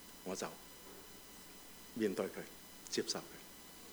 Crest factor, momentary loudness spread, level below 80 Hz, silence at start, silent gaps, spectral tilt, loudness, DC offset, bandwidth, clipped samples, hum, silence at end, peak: 22 dB; 14 LU; -72 dBFS; 0 s; none; -3 dB/octave; -44 LUFS; under 0.1%; over 20 kHz; under 0.1%; none; 0 s; -24 dBFS